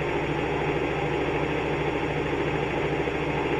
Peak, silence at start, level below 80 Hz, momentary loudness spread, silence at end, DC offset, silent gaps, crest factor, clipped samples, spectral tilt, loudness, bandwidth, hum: -14 dBFS; 0 s; -42 dBFS; 1 LU; 0 s; under 0.1%; none; 14 dB; under 0.1%; -6.5 dB/octave; -27 LUFS; 11 kHz; none